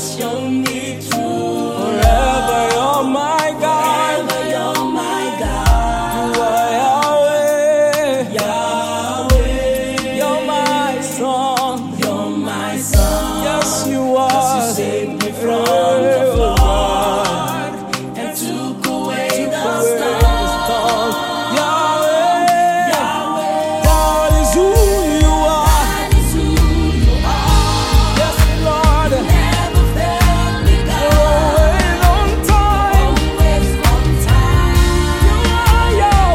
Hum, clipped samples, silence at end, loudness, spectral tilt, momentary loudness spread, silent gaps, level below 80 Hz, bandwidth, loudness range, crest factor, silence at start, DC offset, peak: none; under 0.1%; 0 s; -15 LUFS; -5 dB/octave; 7 LU; none; -18 dBFS; 16.5 kHz; 4 LU; 14 dB; 0 s; under 0.1%; 0 dBFS